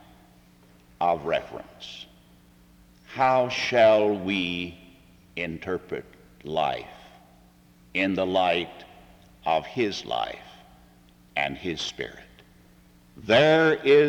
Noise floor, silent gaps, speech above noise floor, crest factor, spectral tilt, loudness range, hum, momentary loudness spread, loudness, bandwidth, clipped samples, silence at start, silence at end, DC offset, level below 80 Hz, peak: -55 dBFS; none; 31 dB; 20 dB; -5 dB/octave; 8 LU; none; 21 LU; -25 LUFS; 17.5 kHz; under 0.1%; 1 s; 0 s; under 0.1%; -60 dBFS; -8 dBFS